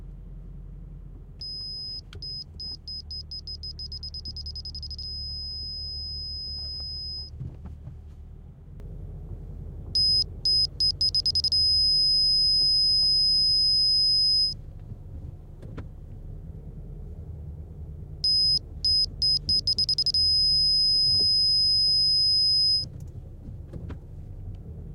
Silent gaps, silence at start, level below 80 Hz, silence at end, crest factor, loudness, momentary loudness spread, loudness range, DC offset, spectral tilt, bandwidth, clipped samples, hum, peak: none; 0 s; -42 dBFS; 0 s; 12 dB; -21 LUFS; 23 LU; 17 LU; under 0.1%; -3 dB/octave; 16 kHz; under 0.1%; none; -14 dBFS